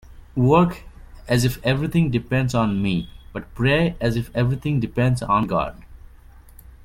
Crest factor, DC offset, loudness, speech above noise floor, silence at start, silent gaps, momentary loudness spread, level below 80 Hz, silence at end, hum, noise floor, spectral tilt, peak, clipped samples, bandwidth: 18 dB; under 0.1%; -21 LUFS; 25 dB; 0.1 s; none; 12 LU; -40 dBFS; 0.1 s; none; -46 dBFS; -7 dB/octave; -4 dBFS; under 0.1%; 16 kHz